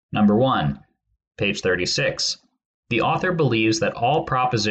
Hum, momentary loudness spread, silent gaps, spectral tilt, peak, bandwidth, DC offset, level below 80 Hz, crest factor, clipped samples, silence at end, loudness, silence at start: none; 7 LU; 1.27-1.31 s, 2.65-2.83 s; -5 dB/octave; -8 dBFS; 8.8 kHz; under 0.1%; -50 dBFS; 14 dB; under 0.1%; 0 s; -21 LUFS; 0.1 s